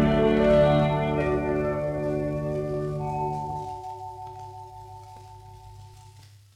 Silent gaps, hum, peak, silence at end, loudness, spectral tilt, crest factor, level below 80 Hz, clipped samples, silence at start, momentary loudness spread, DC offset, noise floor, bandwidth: none; none; -10 dBFS; 0.35 s; -25 LUFS; -8 dB/octave; 16 dB; -42 dBFS; under 0.1%; 0 s; 26 LU; under 0.1%; -50 dBFS; 11 kHz